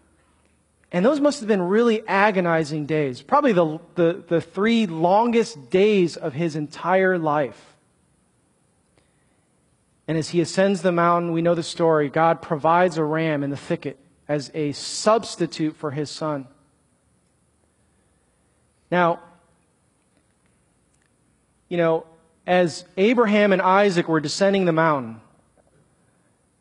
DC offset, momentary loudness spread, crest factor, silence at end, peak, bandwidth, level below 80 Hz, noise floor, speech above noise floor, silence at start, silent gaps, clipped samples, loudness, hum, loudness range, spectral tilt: under 0.1%; 10 LU; 20 dB; 1.4 s; -2 dBFS; 11 kHz; -66 dBFS; -64 dBFS; 44 dB; 0.9 s; none; under 0.1%; -21 LUFS; none; 9 LU; -6 dB/octave